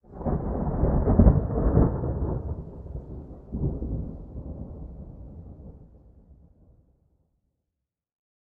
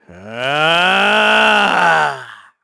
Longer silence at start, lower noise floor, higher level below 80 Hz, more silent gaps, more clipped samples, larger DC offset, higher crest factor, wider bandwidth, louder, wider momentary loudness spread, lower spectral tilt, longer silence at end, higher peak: about the same, 0.1 s vs 0.1 s; first, -85 dBFS vs -34 dBFS; first, -32 dBFS vs -56 dBFS; neither; neither; neither; first, 24 dB vs 14 dB; second, 2.2 kHz vs 11 kHz; second, -26 LUFS vs -12 LUFS; first, 23 LU vs 12 LU; first, -14.5 dB/octave vs -3 dB/octave; first, 2.6 s vs 0.3 s; about the same, -2 dBFS vs 0 dBFS